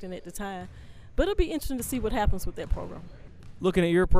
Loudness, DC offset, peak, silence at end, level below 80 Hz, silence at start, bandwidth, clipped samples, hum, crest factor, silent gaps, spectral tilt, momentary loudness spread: -29 LUFS; under 0.1%; -8 dBFS; 0 s; -32 dBFS; 0 s; 15.5 kHz; under 0.1%; none; 18 dB; none; -6 dB/octave; 20 LU